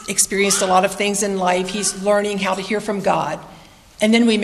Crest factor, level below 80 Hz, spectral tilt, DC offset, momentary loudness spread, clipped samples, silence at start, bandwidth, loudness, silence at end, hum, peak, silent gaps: 16 dB; -52 dBFS; -3 dB/octave; under 0.1%; 7 LU; under 0.1%; 0 s; 14 kHz; -18 LUFS; 0 s; none; -2 dBFS; none